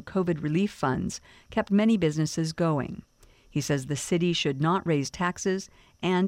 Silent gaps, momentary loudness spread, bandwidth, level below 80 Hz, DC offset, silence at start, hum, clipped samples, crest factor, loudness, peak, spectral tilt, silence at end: none; 10 LU; 15.5 kHz; -54 dBFS; under 0.1%; 0.05 s; none; under 0.1%; 16 dB; -27 LUFS; -12 dBFS; -5.5 dB/octave; 0 s